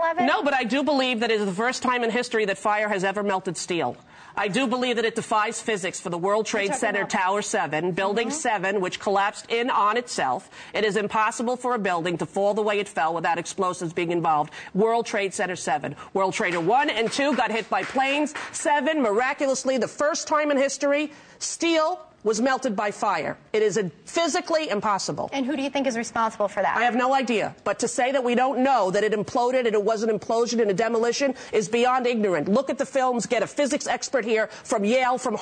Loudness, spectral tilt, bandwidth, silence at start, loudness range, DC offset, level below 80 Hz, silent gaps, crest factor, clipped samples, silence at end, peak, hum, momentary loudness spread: -24 LUFS; -3.5 dB/octave; 9.6 kHz; 0 s; 2 LU; under 0.1%; -66 dBFS; none; 12 dB; under 0.1%; 0 s; -12 dBFS; none; 5 LU